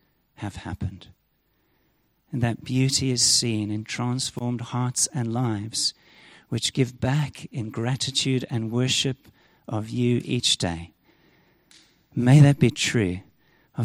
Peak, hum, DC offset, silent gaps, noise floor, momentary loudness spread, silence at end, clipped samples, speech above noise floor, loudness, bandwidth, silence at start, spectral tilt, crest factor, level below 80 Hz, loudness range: -6 dBFS; none; under 0.1%; none; -68 dBFS; 16 LU; 0 s; under 0.1%; 45 dB; -24 LUFS; 15.5 kHz; 0.4 s; -4.5 dB/octave; 20 dB; -54 dBFS; 4 LU